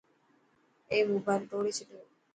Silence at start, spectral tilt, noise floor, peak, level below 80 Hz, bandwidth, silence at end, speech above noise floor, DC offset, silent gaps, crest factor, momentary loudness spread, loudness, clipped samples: 0.9 s; -4.5 dB/octave; -69 dBFS; -16 dBFS; -76 dBFS; 9.4 kHz; 0.3 s; 38 dB; under 0.1%; none; 18 dB; 10 LU; -32 LUFS; under 0.1%